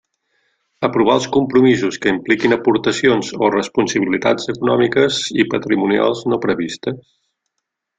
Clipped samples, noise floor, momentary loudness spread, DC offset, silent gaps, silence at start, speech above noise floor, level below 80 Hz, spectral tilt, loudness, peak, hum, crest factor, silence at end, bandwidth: under 0.1%; -77 dBFS; 6 LU; under 0.1%; none; 0.8 s; 61 dB; -54 dBFS; -5 dB/octave; -16 LUFS; -2 dBFS; none; 16 dB; 1 s; 9.4 kHz